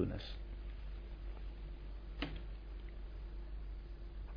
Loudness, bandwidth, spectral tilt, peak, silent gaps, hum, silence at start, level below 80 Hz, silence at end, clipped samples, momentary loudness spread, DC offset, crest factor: -49 LUFS; 5.2 kHz; -5.5 dB/octave; -24 dBFS; none; none; 0 s; -46 dBFS; 0 s; under 0.1%; 6 LU; under 0.1%; 22 dB